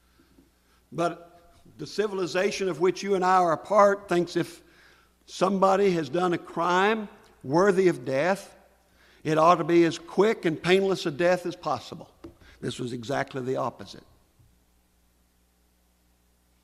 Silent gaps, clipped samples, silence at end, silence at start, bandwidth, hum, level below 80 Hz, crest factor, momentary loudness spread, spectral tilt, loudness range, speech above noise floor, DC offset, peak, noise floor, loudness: none; under 0.1%; 2.65 s; 0.9 s; 14 kHz; 60 Hz at -60 dBFS; -64 dBFS; 20 dB; 15 LU; -5.5 dB/octave; 11 LU; 41 dB; under 0.1%; -6 dBFS; -66 dBFS; -25 LUFS